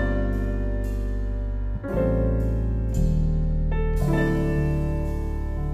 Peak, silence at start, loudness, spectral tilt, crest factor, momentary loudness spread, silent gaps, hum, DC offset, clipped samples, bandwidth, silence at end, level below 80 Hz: -10 dBFS; 0 s; -26 LUFS; -8.5 dB/octave; 12 dB; 7 LU; none; none; under 0.1%; under 0.1%; 9 kHz; 0 s; -26 dBFS